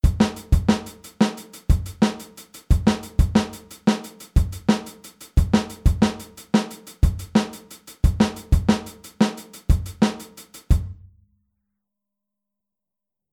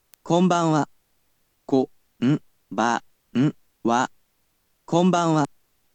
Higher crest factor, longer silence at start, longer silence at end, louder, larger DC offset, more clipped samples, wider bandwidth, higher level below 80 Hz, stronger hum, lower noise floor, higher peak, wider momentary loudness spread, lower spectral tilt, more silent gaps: about the same, 18 dB vs 18 dB; second, 0.05 s vs 0.25 s; first, 2.4 s vs 0.5 s; about the same, -23 LUFS vs -23 LUFS; neither; neither; first, 18 kHz vs 9.2 kHz; first, -26 dBFS vs -70 dBFS; neither; first, -87 dBFS vs -69 dBFS; about the same, -4 dBFS vs -6 dBFS; first, 17 LU vs 10 LU; about the same, -6.5 dB/octave vs -6 dB/octave; neither